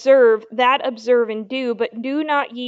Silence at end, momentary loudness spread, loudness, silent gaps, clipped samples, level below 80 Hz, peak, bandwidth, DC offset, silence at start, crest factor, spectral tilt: 0 s; 10 LU; -18 LUFS; none; under 0.1%; -78 dBFS; -4 dBFS; 7.6 kHz; under 0.1%; 0 s; 14 dB; -4.5 dB/octave